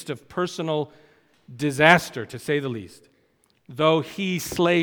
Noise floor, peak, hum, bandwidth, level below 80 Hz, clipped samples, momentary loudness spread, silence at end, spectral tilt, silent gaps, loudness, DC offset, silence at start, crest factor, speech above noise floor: -65 dBFS; 0 dBFS; none; over 20 kHz; -60 dBFS; under 0.1%; 16 LU; 0 s; -5 dB/octave; none; -23 LUFS; under 0.1%; 0 s; 24 dB; 42 dB